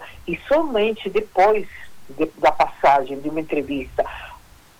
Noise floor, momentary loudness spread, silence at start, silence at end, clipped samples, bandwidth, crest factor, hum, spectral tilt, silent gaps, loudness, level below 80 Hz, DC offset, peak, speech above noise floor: -45 dBFS; 18 LU; 0 s; 0.45 s; under 0.1%; 19 kHz; 18 dB; none; -5.5 dB/octave; none; -21 LUFS; -46 dBFS; under 0.1%; -4 dBFS; 25 dB